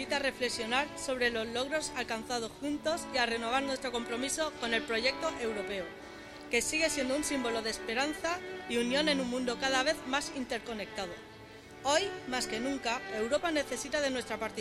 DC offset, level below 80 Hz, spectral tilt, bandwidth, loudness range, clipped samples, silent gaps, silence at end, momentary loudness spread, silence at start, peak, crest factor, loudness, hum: under 0.1%; -60 dBFS; -2.5 dB/octave; 15.5 kHz; 2 LU; under 0.1%; none; 0 s; 9 LU; 0 s; -12 dBFS; 20 dB; -33 LUFS; none